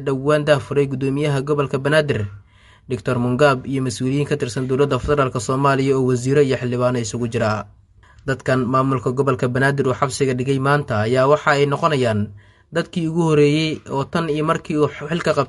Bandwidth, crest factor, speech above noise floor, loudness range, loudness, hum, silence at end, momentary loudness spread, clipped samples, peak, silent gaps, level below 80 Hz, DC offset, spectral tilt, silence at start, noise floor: 11.5 kHz; 18 dB; 30 dB; 2 LU; -19 LUFS; none; 0 s; 8 LU; under 0.1%; -2 dBFS; none; -46 dBFS; under 0.1%; -6 dB/octave; 0 s; -49 dBFS